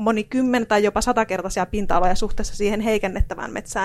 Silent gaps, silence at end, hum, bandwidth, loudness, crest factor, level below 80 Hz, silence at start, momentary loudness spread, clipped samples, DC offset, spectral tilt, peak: none; 0 s; none; 13 kHz; -22 LUFS; 16 dB; -30 dBFS; 0 s; 8 LU; under 0.1%; under 0.1%; -5 dB/octave; -6 dBFS